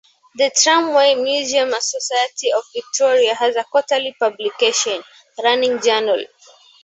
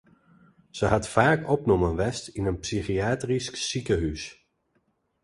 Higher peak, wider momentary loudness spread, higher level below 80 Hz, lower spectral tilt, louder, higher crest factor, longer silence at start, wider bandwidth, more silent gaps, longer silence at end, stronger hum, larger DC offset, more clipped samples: about the same, -2 dBFS vs -4 dBFS; about the same, 9 LU vs 9 LU; second, -72 dBFS vs -42 dBFS; second, 0 dB/octave vs -5 dB/octave; first, -17 LUFS vs -26 LUFS; second, 16 dB vs 24 dB; second, 0.35 s vs 0.75 s; second, 8.2 kHz vs 11.5 kHz; neither; second, 0.6 s vs 0.9 s; neither; neither; neither